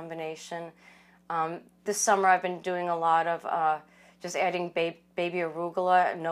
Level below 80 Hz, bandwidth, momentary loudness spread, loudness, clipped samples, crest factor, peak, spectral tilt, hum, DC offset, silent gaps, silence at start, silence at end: -78 dBFS; 15.5 kHz; 14 LU; -28 LUFS; under 0.1%; 20 dB; -10 dBFS; -3.5 dB/octave; none; under 0.1%; none; 0 s; 0 s